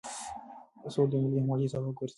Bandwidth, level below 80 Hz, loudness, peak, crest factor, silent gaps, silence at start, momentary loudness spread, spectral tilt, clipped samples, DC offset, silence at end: 11.5 kHz; -66 dBFS; -31 LUFS; -14 dBFS; 16 dB; none; 0.05 s; 18 LU; -7.5 dB/octave; under 0.1%; under 0.1%; 0.05 s